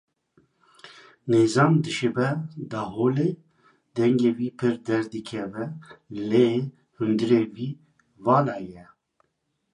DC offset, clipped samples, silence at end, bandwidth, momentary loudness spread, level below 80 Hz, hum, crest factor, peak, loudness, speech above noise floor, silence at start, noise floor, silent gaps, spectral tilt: under 0.1%; under 0.1%; 0.9 s; 11 kHz; 15 LU; -66 dBFS; none; 18 dB; -6 dBFS; -24 LUFS; 51 dB; 0.85 s; -75 dBFS; none; -7 dB/octave